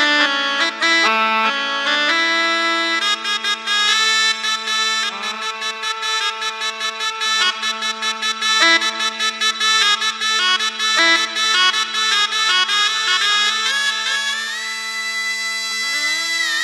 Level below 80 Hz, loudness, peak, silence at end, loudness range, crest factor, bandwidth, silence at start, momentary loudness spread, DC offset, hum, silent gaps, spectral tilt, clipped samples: -84 dBFS; -16 LUFS; 0 dBFS; 0 s; 4 LU; 18 dB; 13 kHz; 0 s; 8 LU; under 0.1%; none; none; 1.5 dB/octave; under 0.1%